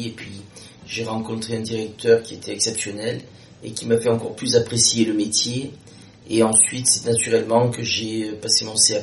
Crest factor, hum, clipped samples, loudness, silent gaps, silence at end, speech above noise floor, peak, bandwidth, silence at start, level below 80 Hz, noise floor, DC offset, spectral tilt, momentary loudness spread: 20 dB; none; under 0.1%; -20 LUFS; none; 0 s; 21 dB; 0 dBFS; 11.5 kHz; 0 s; -58 dBFS; -42 dBFS; under 0.1%; -3 dB/octave; 16 LU